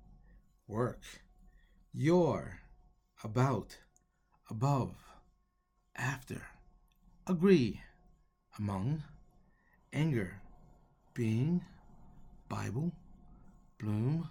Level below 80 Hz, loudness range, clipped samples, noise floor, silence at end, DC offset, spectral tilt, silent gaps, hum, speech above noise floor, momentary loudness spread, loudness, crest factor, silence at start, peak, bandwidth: -60 dBFS; 5 LU; under 0.1%; -76 dBFS; 0 s; under 0.1%; -7.5 dB/octave; none; none; 43 dB; 24 LU; -35 LUFS; 22 dB; 0.1 s; -14 dBFS; 16 kHz